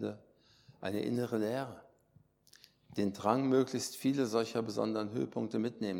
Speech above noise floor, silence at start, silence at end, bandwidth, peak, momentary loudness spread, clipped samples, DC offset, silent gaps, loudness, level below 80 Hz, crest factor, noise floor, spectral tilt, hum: 34 dB; 0 s; 0 s; 18 kHz; -14 dBFS; 12 LU; under 0.1%; under 0.1%; none; -35 LUFS; -78 dBFS; 20 dB; -68 dBFS; -5.5 dB/octave; none